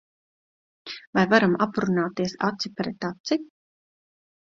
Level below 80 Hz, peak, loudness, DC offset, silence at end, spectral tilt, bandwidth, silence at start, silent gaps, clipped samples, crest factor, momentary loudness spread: -64 dBFS; -2 dBFS; -24 LUFS; under 0.1%; 0.95 s; -6 dB/octave; 7.6 kHz; 0.85 s; 1.07-1.13 s, 3.20-3.24 s; under 0.1%; 24 dB; 14 LU